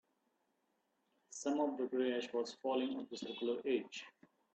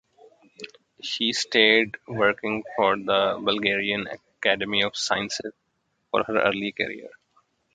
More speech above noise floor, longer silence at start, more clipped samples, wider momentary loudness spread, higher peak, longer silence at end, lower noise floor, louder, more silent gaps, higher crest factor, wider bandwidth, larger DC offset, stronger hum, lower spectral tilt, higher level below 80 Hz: second, 43 dB vs 49 dB; first, 1.3 s vs 0.6 s; neither; second, 12 LU vs 17 LU; second, -24 dBFS vs -4 dBFS; second, 0.45 s vs 0.65 s; first, -82 dBFS vs -74 dBFS; second, -40 LUFS vs -23 LUFS; neither; about the same, 18 dB vs 22 dB; about the same, 8.8 kHz vs 9.4 kHz; neither; neither; about the same, -3.5 dB/octave vs -3 dB/octave; second, -88 dBFS vs -64 dBFS